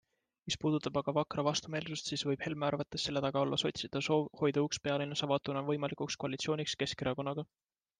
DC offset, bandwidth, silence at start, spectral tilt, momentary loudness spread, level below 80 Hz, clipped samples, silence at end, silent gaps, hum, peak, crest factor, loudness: under 0.1%; 10 kHz; 0.45 s; -4.5 dB/octave; 5 LU; -68 dBFS; under 0.1%; 0.55 s; none; none; -18 dBFS; 18 dB; -35 LUFS